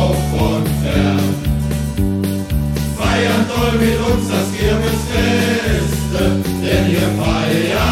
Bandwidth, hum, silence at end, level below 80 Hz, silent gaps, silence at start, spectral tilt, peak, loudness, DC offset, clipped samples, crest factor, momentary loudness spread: 16.5 kHz; none; 0 s; -24 dBFS; none; 0 s; -5.5 dB/octave; -2 dBFS; -16 LUFS; under 0.1%; under 0.1%; 14 dB; 4 LU